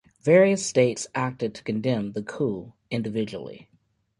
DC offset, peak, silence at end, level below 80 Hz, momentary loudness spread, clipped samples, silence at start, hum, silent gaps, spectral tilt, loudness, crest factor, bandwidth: under 0.1%; -4 dBFS; 0.65 s; -64 dBFS; 14 LU; under 0.1%; 0.25 s; none; none; -5.5 dB/octave; -24 LUFS; 20 dB; 11 kHz